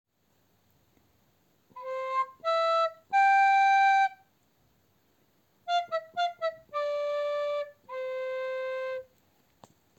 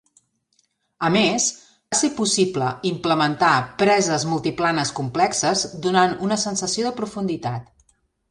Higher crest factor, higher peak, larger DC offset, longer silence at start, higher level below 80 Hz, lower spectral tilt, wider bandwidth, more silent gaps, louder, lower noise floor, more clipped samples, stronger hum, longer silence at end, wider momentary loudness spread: about the same, 14 dB vs 18 dB; second, -16 dBFS vs -4 dBFS; neither; first, 1.75 s vs 1 s; second, -84 dBFS vs -58 dBFS; second, -0.5 dB/octave vs -3.5 dB/octave; second, 8.4 kHz vs 11.5 kHz; neither; second, -28 LUFS vs -21 LUFS; first, -71 dBFS vs -67 dBFS; neither; neither; first, 0.95 s vs 0.7 s; first, 15 LU vs 8 LU